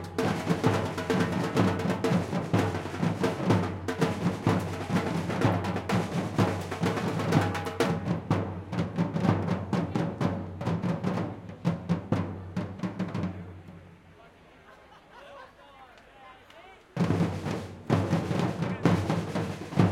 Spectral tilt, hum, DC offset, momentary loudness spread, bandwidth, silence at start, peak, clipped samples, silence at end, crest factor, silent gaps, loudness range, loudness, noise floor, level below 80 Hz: -7 dB/octave; none; under 0.1%; 8 LU; 15.5 kHz; 0 s; -8 dBFS; under 0.1%; 0 s; 22 dB; none; 8 LU; -29 LUFS; -54 dBFS; -60 dBFS